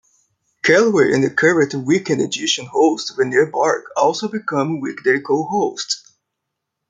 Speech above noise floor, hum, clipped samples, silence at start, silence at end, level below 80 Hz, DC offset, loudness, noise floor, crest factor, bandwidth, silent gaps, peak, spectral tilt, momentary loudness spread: 61 dB; none; under 0.1%; 0.65 s; 0.9 s; -64 dBFS; under 0.1%; -17 LUFS; -78 dBFS; 16 dB; 9.4 kHz; none; -2 dBFS; -4 dB/octave; 7 LU